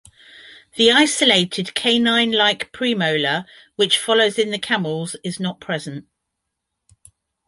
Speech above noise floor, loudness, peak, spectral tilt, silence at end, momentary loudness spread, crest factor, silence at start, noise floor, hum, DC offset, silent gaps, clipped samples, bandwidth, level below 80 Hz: 60 dB; -18 LUFS; -2 dBFS; -3 dB/octave; 1.45 s; 13 LU; 18 dB; 0.35 s; -79 dBFS; none; under 0.1%; none; under 0.1%; 11.5 kHz; -62 dBFS